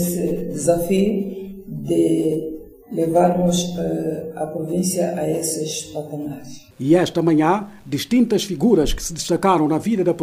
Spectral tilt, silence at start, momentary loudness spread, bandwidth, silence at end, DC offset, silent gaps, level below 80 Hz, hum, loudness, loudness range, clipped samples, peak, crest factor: -5.5 dB/octave; 0 s; 13 LU; 16 kHz; 0 s; under 0.1%; none; -40 dBFS; none; -20 LUFS; 4 LU; under 0.1%; -4 dBFS; 16 dB